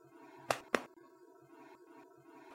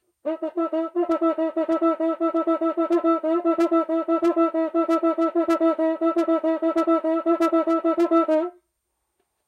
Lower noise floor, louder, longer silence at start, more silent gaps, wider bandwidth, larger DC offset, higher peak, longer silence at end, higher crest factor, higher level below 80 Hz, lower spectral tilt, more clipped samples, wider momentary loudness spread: second, -61 dBFS vs -77 dBFS; second, -38 LUFS vs -22 LUFS; second, 0 s vs 0.25 s; neither; first, 16.5 kHz vs 7.4 kHz; neither; about the same, -10 dBFS vs -8 dBFS; second, 0 s vs 0.95 s; first, 34 dB vs 14 dB; about the same, -80 dBFS vs -76 dBFS; second, -3 dB/octave vs -5 dB/octave; neither; first, 25 LU vs 5 LU